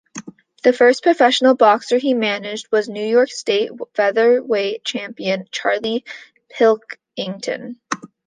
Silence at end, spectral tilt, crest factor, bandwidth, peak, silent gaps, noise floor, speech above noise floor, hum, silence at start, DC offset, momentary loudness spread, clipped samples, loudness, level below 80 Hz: 0.2 s; -3.5 dB/octave; 16 dB; 9.6 kHz; -2 dBFS; none; -37 dBFS; 20 dB; none; 0.15 s; under 0.1%; 15 LU; under 0.1%; -18 LUFS; -70 dBFS